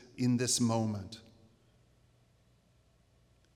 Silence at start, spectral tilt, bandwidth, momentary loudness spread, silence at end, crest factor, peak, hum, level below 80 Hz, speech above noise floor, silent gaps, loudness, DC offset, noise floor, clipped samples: 0.15 s; -4.5 dB/octave; 16 kHz; 19 LU; 2.35 s; 20 dB; -18 dBFS; none; -72 dBFS; 37 dB; none; -31 LUFS; under 0.1%; -68 dBFS; under 0.1%